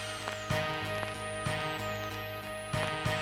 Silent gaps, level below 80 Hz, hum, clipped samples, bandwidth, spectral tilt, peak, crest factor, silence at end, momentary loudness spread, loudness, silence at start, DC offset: none; -54 dBFS; none; under 0.1%; 17.5 kHz; -4 dB/octave; -16 dBFS; 18 dB; 0 s; 6 LU; -35 LUFS; 0 s; under 0.1%